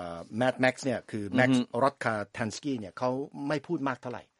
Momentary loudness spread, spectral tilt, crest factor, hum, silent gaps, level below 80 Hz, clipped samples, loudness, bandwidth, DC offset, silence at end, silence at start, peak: 9 LU; -5.5 dB/octave; 20 dB; none; none; -70 dBFS; under 0.1%; -30 LUFS; 11.5 kHz; under 0.1%; 0.2 s; 0 s; -10 dBFS